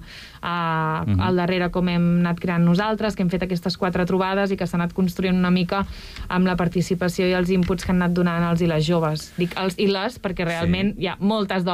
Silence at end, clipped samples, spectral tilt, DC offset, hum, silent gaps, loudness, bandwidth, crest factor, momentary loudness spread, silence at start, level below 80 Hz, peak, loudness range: 0 s; under 0.1%; -7 dB/octave; under 0.1%; none; none; -22 LUFS; 14 kHz; 10 dB; 6 LU; 0 s; -42 dBFS; -10 dBFS; 1 LU